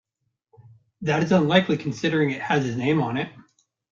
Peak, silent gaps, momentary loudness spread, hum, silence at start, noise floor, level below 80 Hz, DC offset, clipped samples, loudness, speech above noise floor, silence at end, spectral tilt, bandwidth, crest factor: -4 dBFS; none; 10 LU; none; 1 s; -78 dBFS; -62 dBFS; under 0.1%; under 0.1%; -23 LUFS; 56 dB; 0.5 s; -6.5 dB/octave; 7.4 kHz; 20 dB